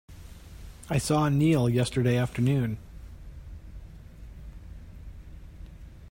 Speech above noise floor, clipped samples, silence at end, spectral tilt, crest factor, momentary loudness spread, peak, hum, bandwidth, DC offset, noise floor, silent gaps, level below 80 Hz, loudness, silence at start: 21 dB; under 0.1%; 0 s; -6.5 dB/octave; 16 dB; 25 LU; -12 dBFS; none; 16 kHz; under 0.1%; -45 dBFS; none; -46 dBFS; -26 LUFS; 0.1 s